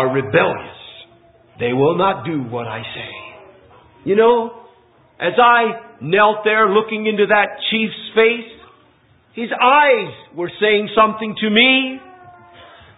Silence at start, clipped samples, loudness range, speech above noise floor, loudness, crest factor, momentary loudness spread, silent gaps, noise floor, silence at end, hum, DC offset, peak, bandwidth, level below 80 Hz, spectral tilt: 0 s; under 0.1%; 6 LU; 38 dB; -15 LUFS; 16 dB; 17 LU; none; -54 dBFS; 0.7 s; none; under 0.1%; 0 dBFS; 4 kHz; -58 dBFS; -10 dB/octave